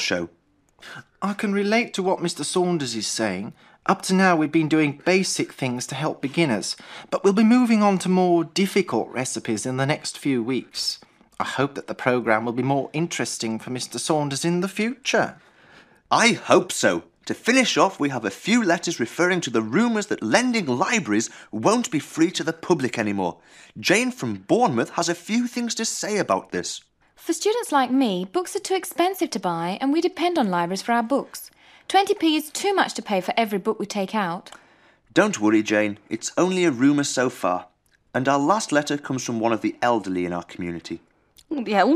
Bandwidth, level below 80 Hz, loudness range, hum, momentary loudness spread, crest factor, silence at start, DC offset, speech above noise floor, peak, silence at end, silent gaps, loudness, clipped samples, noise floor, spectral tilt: 15.5 kHz; -68 dBFS; 4 LU; none; 10 LU; 22 dB; 0 s; under 0.1%; 33 dB; -2 dBFS; 0 s; none; -22 LUFS; under 0.1%; -56 dBFS; -4 dB/octave